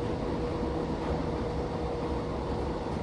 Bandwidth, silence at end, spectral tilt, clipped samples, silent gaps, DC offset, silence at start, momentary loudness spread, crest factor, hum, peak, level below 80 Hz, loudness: 11 kHz; 0 s; -7.5 dB/octave; under 0.1%; none; under 0.1%; 0 s; 1 LU; 12 dB; none; -20 dBFS; -40 dBFS; -33 LUFS